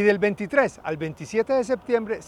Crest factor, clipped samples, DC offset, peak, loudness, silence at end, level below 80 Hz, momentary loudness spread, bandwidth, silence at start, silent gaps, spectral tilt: 18 dB; under 0.1%; under 0.1%; -6 dBFS; -24 LUFS; 0 s; -58 dBFS; 8 LU; 11.5 kHz; 0 s; none; -6 dB/octave